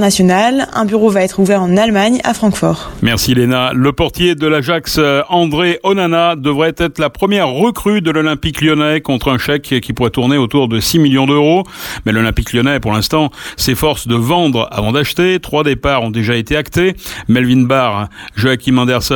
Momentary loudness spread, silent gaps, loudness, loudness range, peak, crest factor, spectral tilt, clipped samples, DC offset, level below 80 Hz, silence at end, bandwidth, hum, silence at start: 5 LU; none; -13 LUFS; 1 LU; 0 dBFS; 12 dB; -5 dB/octave; under 0.1%; under 0.1%; -34 dBFS; 0 s; 19 kHz; none; 0 s